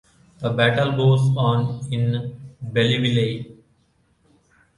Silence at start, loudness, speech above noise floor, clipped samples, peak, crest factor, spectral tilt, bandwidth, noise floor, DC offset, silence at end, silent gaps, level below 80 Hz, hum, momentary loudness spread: 0.4 s; -21 LUFS; 43 dB; under 0.1%; -4 dBFS; 18 dB; -7 dB/octave; 11 kHz; -63 dBFS; under 0.1%; 1.25 s; none; -54 dBFS; none; 14 LU